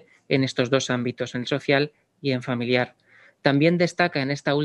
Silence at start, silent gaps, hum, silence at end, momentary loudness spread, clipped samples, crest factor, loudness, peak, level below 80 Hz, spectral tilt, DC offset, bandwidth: 0.3 s; none; none; 0 s; 8 LU; under 0.1%; 22 dB; -24 LUFS; -2 dBFS; -68 dBFS; -5.5 dB/octave; under 0.1%; 11 kHz